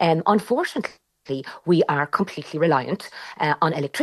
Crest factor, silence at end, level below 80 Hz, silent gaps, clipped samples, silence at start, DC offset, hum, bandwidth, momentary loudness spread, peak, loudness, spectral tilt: 18 dB; 0 s; -68 dBFS; none; under 0.1%; 0 s; under 0.1%; none; 12.5 kHz; 12 LU; -4 dBFS; -23 LUFS; -6.5 dB/octave